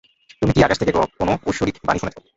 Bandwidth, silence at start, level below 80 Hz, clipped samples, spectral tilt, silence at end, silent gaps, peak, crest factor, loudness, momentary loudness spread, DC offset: 8 kHz; 0.4 s; -38 dBFS; under 0.1%; -6 dB/octave; 0.2 s; none; -2 dBFS; 18 dB; -20 LUFS; 7 LU; under 0.1%